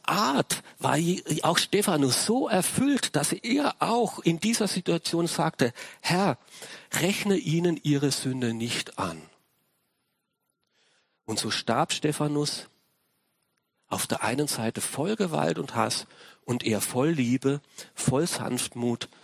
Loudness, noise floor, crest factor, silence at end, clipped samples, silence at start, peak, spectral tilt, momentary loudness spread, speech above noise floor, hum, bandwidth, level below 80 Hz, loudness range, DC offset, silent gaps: -27 LUFS; -79 dBFS; 20 dB; 0.2 s; under 0.1%; 0.05 s; -6 dBFS; -4 dB/octave; 8 LU; 52 dB; none; 16 kHz; -64 dBFS; 6 LU; under 0.1%; none